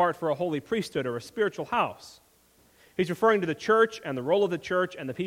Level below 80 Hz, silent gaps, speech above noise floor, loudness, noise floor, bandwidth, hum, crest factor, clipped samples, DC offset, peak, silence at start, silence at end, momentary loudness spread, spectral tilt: -66 dBFS; none; 35 dB; -27 LUFS; -62 dBFS; 16 kHz; none; 18 dB; under 0.1%; under 0.1%; -8 dBFS; 0 s; 0 s; 8 LU; -5.5 dB/octave